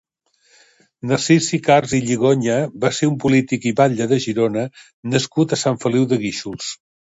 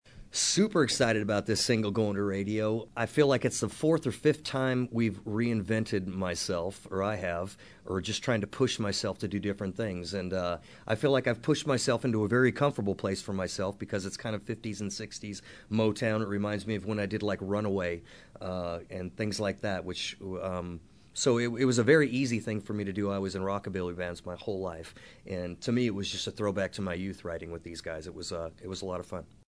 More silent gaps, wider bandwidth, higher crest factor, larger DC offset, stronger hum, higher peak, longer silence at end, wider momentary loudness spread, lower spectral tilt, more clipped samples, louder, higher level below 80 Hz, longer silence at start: first, 4.93-5.03 s vs none; second, 8 kHz vs 11 kHz; about the same, 18 dB vs 22 dB; neither; neither; first, 0 dBFS vs -10 dBFS; about the same, 0.25 s vs 0.25 s; about the same, 11 LU vs 13 LU; about the same, -5 dB/octave vs -5 dB/octave; neither; first, -18 LUFS vs -31 LUFS; about the same, -56 dBFS vs -60 dBFS; first, 1.05 s vs 0.15 s